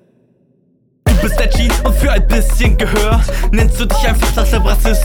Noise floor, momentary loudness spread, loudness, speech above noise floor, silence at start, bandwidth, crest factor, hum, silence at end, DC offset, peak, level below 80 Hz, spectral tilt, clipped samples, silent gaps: -56 dBFS; 2 LU; -14 LUFS; 45 dB; 1.05 s; 18 kHz; 12 dB; none; 0 s; under 0.1%; 0 dBFS; -12 dBFS; -5 dB/octave; under 0.1%; none